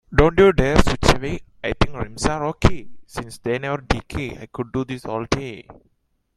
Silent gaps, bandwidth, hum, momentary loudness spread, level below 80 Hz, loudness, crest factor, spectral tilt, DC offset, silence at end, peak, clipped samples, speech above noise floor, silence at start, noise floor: none; 13.5 kHz; none; 17 LU; -30 dBFS; -21 LUFS; 20 dB; -5.5 dB/octave; under 0.1%; 0.65 s; 0 dBFS; under 0.1%; 47 dB; 0.1 s; -67 dBFS